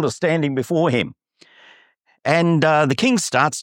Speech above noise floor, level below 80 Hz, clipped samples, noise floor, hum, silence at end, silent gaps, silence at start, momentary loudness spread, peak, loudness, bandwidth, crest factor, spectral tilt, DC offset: 39 dB; -62 dBFS; under 0.1%; -57 dBFS; none; 0 s; none; 0 s; 6 LU; -2 dBFS; -18 LUFS; 16.5 kHz; 18 dB; -5 dB/octave; under 0.1%